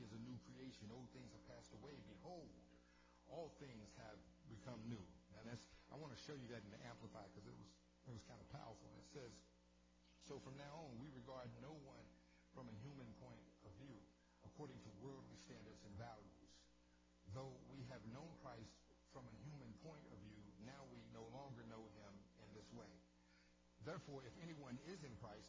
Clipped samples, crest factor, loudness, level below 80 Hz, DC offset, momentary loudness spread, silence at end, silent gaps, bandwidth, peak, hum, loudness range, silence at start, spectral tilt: under 0.1%; 18 dB; -60 LUFS; -74 dBFS; under 0.1%; 9 LU; 0 s; none; 8 kHz; -40 dBFS; 60 Hz at -70 dBFS; 3 LU; 0 s; -6 dB/octave